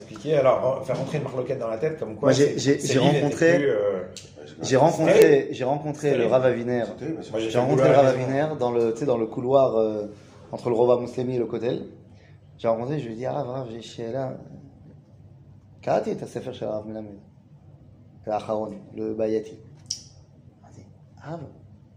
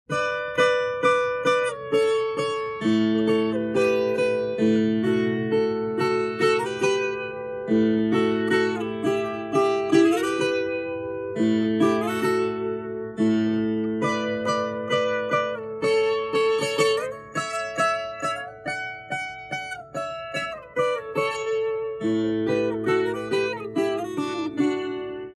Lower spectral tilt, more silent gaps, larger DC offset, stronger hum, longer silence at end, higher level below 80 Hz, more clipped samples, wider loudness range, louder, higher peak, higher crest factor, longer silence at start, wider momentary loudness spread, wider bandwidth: about the same, -6 dB/octave vs -5.5 dB/octave; neither; neither; neither; first, 0.2 s vs 0.05 s; about the same, -62 dBFS vs -62 dBFS; neither; first, 11 LU vs 5 LU; about the same, -23 LUFS vs -24 LUFS; first, 0 dBFS vs -6 dBFS; first, 24 dB vs 16 dB; about the same, 0 s vs 0.1 s; first, 17 LU vs 9 LU; first, 15.5 kHz vs 13 kHz